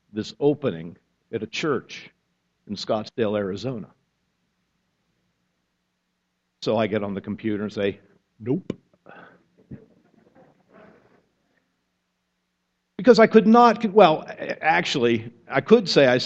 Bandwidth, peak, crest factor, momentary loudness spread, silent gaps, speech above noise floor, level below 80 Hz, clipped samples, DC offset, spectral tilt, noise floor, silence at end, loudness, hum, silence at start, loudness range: 8 kHz; 0 dBFS; 24 dB; 21 LU; none; 55 dB; -64 dBFS; under 0.1%; under 0.1%; -6 dB/octave; -75 dBFS; 0 s; -21 LUFS; none; 0.15 s; 17 LU